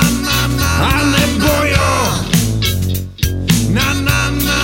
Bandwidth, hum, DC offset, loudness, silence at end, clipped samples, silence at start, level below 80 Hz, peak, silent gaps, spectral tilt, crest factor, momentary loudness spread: 16.5 kHz; none; under 0.1%; -14 LUFS; 0 s; under 0.1%; 0 s; -24 dBFS; 0 dBFS; none; -4 dB/octave; 14 dB; 5 LU